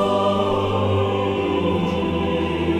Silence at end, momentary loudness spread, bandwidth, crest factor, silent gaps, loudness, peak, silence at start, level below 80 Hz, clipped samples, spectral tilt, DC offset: 0 s; 3 LU; 11 kHz; 12 dB; none; -21 LUFS; -8 dBFS; 0 s; -40 dBFS; under 0.1%; -7.5 dB/octave; under 0.1%